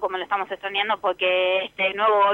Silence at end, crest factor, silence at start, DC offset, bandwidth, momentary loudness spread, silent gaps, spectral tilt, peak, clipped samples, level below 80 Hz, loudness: 0 s; 14 dB; 0 s; under 0.1%; 6 kHz; 7 LU; none; -4.5 dB/octave; -8 dBFS; under 0.1%; -66 dBFS; -22 LUFS